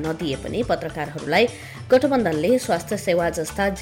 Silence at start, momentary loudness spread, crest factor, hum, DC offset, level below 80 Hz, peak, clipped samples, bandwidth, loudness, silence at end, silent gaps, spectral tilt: 0 s; 8 LU; 14 dB; none; under 0.1%; -46 dBFS; -8 dBFS; under 0.1%; 17 kHz; -22 LUFS; 0 s; none; -5 dB/octave